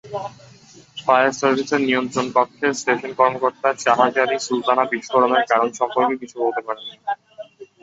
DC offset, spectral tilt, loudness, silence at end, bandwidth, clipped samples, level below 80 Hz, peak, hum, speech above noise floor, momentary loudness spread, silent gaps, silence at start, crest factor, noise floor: under 0.1%; -3.5 dB/octave; -19 LUFS; 0.2 s; 8 kHz; under 0.1%; -66 dBFS; 0 dBFS; none; 28 dB; 13 LU; none; 0.05 s; 20 dB; -47 dBFS